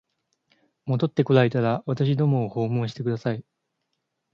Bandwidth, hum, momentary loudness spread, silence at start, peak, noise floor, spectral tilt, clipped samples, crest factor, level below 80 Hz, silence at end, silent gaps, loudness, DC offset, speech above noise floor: 6.8 kHz; none; 10 LU; 0.85 s; -4 dBFS; -78 dBFS; -9 dB/octave; under 0.1%; 20 dB; -64 dBFS; 0.9 s; none; -24 LUFS; under 0.1%; 55 dB